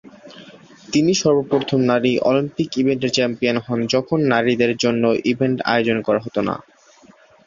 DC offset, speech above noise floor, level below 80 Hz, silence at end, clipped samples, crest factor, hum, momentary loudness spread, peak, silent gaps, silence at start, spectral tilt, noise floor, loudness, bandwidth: under 0.1%; 32 dB; -56 dBFS; 0.85 s; under 0.1%; 18 dB; none; 5 LU; -2 dBFS; none; 0.05 s; -5 dB/octave; -50 dBFS; -19 LUFS; 7.6 kHz